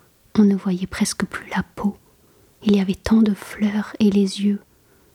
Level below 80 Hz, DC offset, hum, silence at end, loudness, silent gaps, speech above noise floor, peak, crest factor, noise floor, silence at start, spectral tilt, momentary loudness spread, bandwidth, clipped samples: -48 dBFS; under 0.1%; none; 0.55 s; -21 LUFS; none; 35 dB; -4 dBFS; 16 dB; -55 dBFS; 0.35 s; -6 dB/octave; 9 LU; 14 kHz; under 0.1%